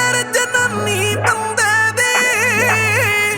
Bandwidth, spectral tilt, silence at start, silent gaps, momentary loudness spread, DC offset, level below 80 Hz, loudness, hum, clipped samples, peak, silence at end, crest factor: over 20 kHz; -2.5 dB/octave; 0 s; none; 4 LU; under 0.1%; -50 dBFS; -14 LUFS; none; under 0.1%; -2 dBFS; 0 s; 14 dB